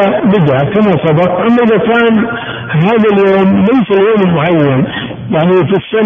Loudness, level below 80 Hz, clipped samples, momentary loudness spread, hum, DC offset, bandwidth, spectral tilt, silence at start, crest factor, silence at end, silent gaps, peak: -10 LUFS; -42 dBFS; under 0.1%; 6 LU; none; under 0.1%; 3.7 kHz; -9.5 dB/octave; 0 s; 8 dB; 0 s; none; 0 dBFS